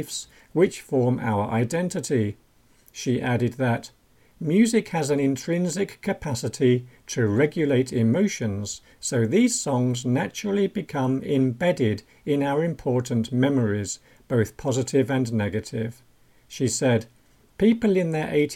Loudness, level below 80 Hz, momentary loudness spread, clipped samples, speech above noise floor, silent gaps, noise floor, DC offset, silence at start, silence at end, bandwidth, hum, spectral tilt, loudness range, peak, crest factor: -24 LUFS; -56 dBFS; 9 LU; under 0.1%; 34 dB; none; -57 dBFS; under 0.1%; 0 s; 0 s; 16.5 kHz; none; -6 dB/octave; 2 LU; -6 dBFS; 18 dB